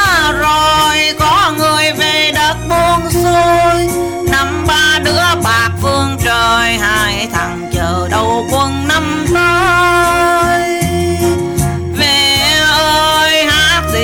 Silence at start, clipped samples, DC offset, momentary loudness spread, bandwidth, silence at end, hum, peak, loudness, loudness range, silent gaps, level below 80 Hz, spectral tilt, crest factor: 0 s; under 0.1%; 0.2%; 5 LU; 19 kHz; 0 s; none; 0 dBFS; -11 LUFS; 2 LU; none; -28 dBFS; -3.5 dB/octave; 10 dB